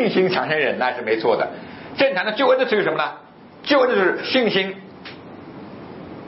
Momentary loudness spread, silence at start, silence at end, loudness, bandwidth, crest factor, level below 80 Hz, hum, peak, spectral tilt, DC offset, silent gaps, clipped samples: 20 LU; 0 s; 0 s; -19 LUFS; 6 kHz; 18 dB; -64 dBFS; none; -4 dBFS; -8 dB/octave; under 0.1%; none; under 0.1%